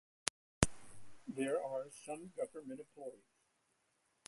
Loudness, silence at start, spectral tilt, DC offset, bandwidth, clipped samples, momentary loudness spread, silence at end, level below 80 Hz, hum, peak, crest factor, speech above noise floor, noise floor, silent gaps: -42 LUFS; 0.25 s; -4 dB/octave; under 0.1%; 11.5 kHz; under 0.1%; 15 LU; 1.1 s; -58 dBFS; none; -6 dBFS; 38 dB; 37 dB; -80 dBFS; 0.30-0.61 s